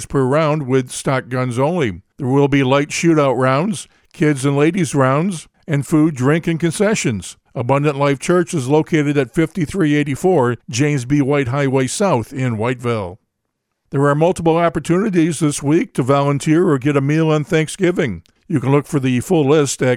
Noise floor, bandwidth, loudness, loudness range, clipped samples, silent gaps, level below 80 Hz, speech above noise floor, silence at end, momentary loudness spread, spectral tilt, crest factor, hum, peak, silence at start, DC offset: -74 dBFS; 14.5 kHz; -17 LUFS; 2 LU; under 0.1%; none; -48 dBFS; 58 dB; 0 s; 7 LU; -6 dB/octave; 16 dB; none; -2 dBFS; 0 s; under 0.1%